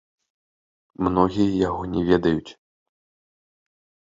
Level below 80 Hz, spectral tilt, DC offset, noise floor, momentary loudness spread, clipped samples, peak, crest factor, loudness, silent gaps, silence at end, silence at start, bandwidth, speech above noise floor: -46 dBFS; -8 dB/octave; under 0.1%; under -90 dBFS; 6 LU; under 0.1%; -4 dBFS; 22 dB; -22 LUFS; none; 1.65 s; 1 s; 7.6 kHz; over 69 dB